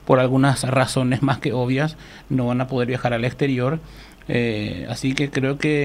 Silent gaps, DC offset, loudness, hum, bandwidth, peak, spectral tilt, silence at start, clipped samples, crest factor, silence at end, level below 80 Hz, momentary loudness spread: none; under 0.1%; -21 LUFS; none; 14.5 kHz; 0 dBFS; -6 dB/octave; 0.05 s; under 0.1%; 20 dB; 0 s; -46 dBFS; 8 LU